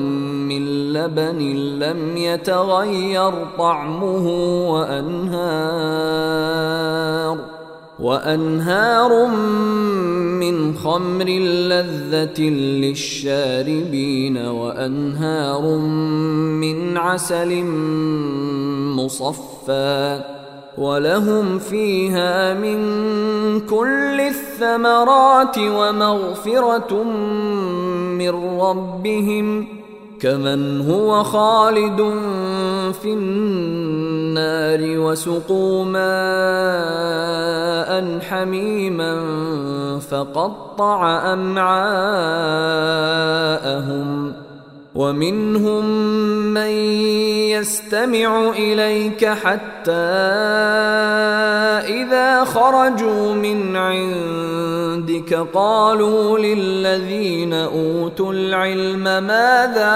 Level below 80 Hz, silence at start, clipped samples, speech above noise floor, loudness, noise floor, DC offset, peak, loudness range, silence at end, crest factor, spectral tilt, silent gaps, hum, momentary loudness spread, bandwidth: -56 dBFS; 0 s; under 0.1%; 22 dB; -18 LUFS; -40 dBFS; under 0.1%; 0 dBFS; 5 LU; 0 s; 18 dB; -5 dB/octave; none; none; 7 LU; 16 kHz